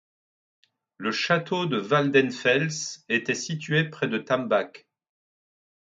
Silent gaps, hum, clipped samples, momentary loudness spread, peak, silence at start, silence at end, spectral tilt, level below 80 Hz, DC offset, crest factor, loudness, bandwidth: none; none; under 0.1%; 8 LU; -6 dBFS; 1 s; 1.1 s; -4.5 dB/octave; -72 dBFS; under 0.1%; 22 dB; -25 LUFS; 9.2 kHz